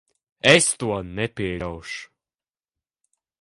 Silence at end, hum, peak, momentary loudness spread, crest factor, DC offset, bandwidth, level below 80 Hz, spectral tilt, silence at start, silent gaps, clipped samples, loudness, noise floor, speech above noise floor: 1.35 s; none; -2 dBFS; 18 LU; 24 dB; under 0.1%; 11.5 kHz; -50 dBFS; -3 dB/octave; 0.45 s; none; under 0.1%; -21 LUFS; under -90 dBFS; over 68 dB